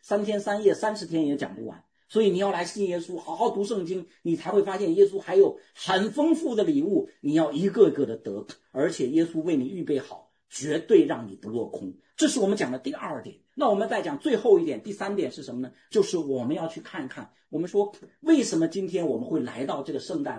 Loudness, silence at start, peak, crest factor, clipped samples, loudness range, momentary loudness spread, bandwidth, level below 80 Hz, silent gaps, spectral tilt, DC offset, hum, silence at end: -26 LUFS; 0.05 s; -6 dBFS; 20 dB; under 0.1%; 4 LU; 14 LU; 10.5 kHz; -74 dBFS; none; -5.5 dB/octave; under 0.1%; none; 0 s